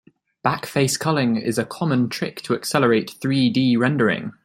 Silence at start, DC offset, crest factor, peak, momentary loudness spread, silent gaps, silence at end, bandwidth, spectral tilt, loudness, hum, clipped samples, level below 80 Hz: 0.45 s; under 0.1%; 18 dB; -2 dBFS; 6 LU; none; 0.15 s; 16 kHz; -5 dB/octave; -21 LUFS; none; under 0.1%; -60 dBFS